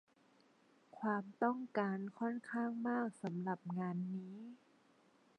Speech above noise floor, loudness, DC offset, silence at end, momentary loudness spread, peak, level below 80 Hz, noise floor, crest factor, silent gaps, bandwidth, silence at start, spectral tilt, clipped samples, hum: 31 dB; -41 LUFS; under 0.1%; 0.85 s; 7 LU; -22 dBFS; under -90 dBFS; -71 dBFS; 20 dB; none; 10 kHz; 0.95 s; -8.5 dB/octave; under 0.1%; none